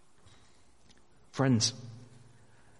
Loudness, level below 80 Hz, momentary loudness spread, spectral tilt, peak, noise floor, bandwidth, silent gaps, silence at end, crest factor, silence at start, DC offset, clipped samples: -29 LUFS; -68 dBFS; 24 LU; -4.5 dB/octave; -14 dBFS; -64 dBFS; 11.5 kHz; none; 0.8 s; 22 dB; 1.35 s; 0.1%; under 0.1%